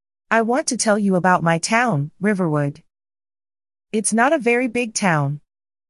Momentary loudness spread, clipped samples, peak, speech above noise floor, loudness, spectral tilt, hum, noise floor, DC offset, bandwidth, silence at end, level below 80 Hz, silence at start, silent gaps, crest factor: 6 LU; under 0.1%; -2 dBFS; over 72 dB; -19 LUFS; -4.5 dB/octave; none; under -90 dBFS; under 0.1%; 12 kHz; 0.5 s; -64 dBFS; 0.3 s; none; 18 dB